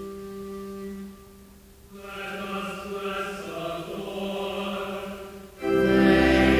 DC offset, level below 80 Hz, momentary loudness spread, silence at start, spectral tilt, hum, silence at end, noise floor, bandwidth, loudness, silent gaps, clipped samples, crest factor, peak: under 0.1%; -42 dBFS; 20 LU; 0 s; -6 dB/octave; none; 0 s; -50 dBFS; 16 kHz; -27 LUFS; none; under 0.1%; 20 dB; -6 dBFS